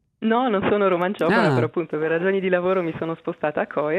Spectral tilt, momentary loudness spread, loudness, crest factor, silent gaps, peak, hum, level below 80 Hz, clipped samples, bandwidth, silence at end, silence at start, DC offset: -7.5 dB/octave; 7 LU; -22 LUFS; 16 dB; none; -4 dBFS; none; -62 dBFS; under 0.1%; 10.5 kHz; 0 s; 0.2 s; under 0.1%